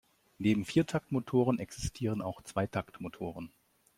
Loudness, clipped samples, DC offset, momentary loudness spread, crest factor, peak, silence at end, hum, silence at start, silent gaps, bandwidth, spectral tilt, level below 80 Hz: -33 LUFS; under 0.1%; under 0.1%; 12 LU; 20 dB; -14 dBFS; 0.5 s; none; 0.4 s; none; 16 kHz; -6.5 dB/octave; -56 dBFS